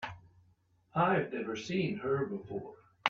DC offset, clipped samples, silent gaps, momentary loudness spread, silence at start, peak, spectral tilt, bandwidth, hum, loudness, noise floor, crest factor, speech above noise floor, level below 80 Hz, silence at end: under 0.1%; under 0.1%; none; 13 LU; 0 s; -10 dBFS; -6 dB/octave; 7.6 kHz; none; -34 LUFS; -69 dBFS; 26 dB; 36 dB; -70 dBFS; 0 s